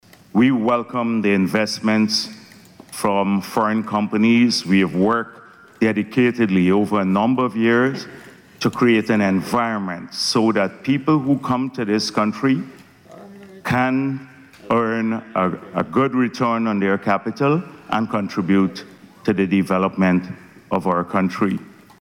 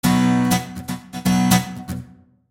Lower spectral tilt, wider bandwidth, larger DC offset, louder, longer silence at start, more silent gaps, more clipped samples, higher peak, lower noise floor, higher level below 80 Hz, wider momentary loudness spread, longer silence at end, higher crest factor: about the same, -6 dB/octave vs -5 dB/octave; about the same, 16 kHz vs 17 kHz; neither; about the same, -19 LUFS vs -19 LUFS; first, 0.35 s vs 0.05 s; neither; neither; second, -6 dBFS vs -2 dBFS; about the same, -45 dBFS vs -43 dBFS; second, -60 dBFS vs -44 dBFS; second, 8 LU vs 15 LU; second, 0.3 s vs 0.45 s; second, 12 dB vs 18 dB